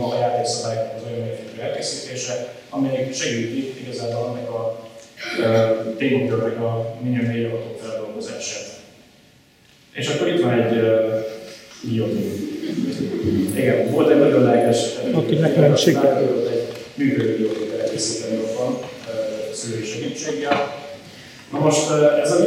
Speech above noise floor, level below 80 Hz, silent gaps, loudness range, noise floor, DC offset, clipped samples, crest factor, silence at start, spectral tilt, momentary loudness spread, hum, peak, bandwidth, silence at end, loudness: 33 dB; -64 dBFS; none; 9 LU; -52 dBFS; under 0.1%; under 0.1%; 20 dB; 0 s; -5.5 dB/octave; 14 LU; none; -2 dBFS; 16.5 kHz; 0 s; -21 LUFS